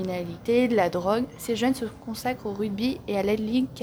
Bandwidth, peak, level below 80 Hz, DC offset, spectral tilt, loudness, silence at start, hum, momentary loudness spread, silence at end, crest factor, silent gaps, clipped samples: over 20 kHz; -10 dBFS; -54 dBFS; under 0.1%; -5.5 dB/octave; -26 LUFS; 0 s; none; 8 LU; 0 s; 16 dB; none; under 0.1%